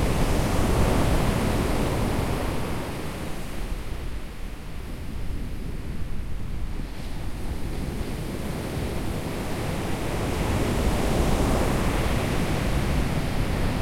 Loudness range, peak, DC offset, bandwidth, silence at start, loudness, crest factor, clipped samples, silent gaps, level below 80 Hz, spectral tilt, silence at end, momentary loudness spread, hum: 10 LU; -8 dBFS; under 0.1%; 16.5 kHz; 0 s; -28 LUFS; 16 dB; under 0.1%; none; -30 dBFS; -6 dB/octave; 0 s; 12 LU; none